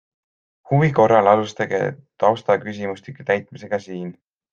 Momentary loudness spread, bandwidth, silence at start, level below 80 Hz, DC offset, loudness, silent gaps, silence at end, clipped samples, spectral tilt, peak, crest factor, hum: 15 LU; 7.4 kHz; 0.7 s; -60 dBFS; under 0.1%; -20 LUFS; none; 0.4 s; under 0.1%; -7 dB/octave; -2 dBFS; 20 dB; none